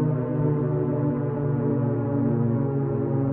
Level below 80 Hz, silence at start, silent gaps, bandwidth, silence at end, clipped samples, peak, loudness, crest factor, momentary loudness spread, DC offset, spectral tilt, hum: -50 dBFS; 0 s; none; 2.9 kHz; 0 s; under 0.1%; -12 dBFS; -25 LUFS; 12 dB; 2 LU; under 0.1%; -14.5 dB/octave; none